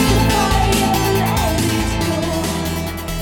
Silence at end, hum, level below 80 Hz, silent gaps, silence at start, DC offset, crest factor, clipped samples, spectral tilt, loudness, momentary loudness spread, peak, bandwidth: 0 s; none; -26 dBFS; none; 0 s; under 0.1%; 12 dB; under 0.1%; -4.5 dB/octave; -17 LUFS; 7 LU; -4 dBFS; 18 kHz